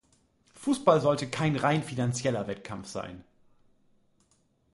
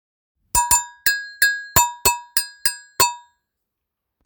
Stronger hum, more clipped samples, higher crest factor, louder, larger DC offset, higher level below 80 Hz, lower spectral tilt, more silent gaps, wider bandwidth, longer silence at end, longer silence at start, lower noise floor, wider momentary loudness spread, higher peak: neither; neither; about the same, 24 dB vs 22 dB; second, -28 LUFS vs -19 LUFS; neither; second, -62 dBFS vs -44 dBFS; first, -5.5 dB/octave vs 0 dB/octave; neither; second, 11.5 kHz vs over 20 kHz; first, 1.55 s vs 1.05 s; about the same, 0.6 s vs 0.55 s; second, -69 dBFS vs -81 dBFS; first, 15 LU vs 6 LU; second, -6 dBFS vs 0 dBFS